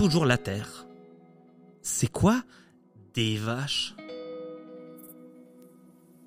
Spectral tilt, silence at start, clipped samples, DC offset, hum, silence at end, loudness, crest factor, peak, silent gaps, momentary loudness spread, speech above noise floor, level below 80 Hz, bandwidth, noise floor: -4.5 dB/octave; 0 s; under 0.1%; under 0.1%; none; 0.65 s; -28 LUFS; 24 dB; -6 dBFS; none; 23 LU; 30 dB; -54 dBFS; 16 kHz; -56 dBFS